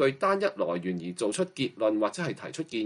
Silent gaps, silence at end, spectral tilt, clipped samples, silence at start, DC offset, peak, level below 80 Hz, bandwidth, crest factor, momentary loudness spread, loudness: none; 0 s; -5 dB/octave; under 0.1%; 0 s; under 0.1%; -12 dBFS; -72 dBFS; 11.5 kHz; 16 dB; 8 LU; -29 LUFS